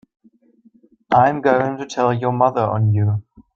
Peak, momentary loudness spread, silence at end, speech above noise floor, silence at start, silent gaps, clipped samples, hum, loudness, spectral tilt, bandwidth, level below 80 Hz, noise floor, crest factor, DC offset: -2 dBFS; 6 LU; 0.35 s; 37 dB; 1.1 s; none; under 0.1%; none; -18 LUFS; -7.5 dB/octave; 7.2 kHz; -58 dBFS; -54 dBFS; 18 dB; under 0.1%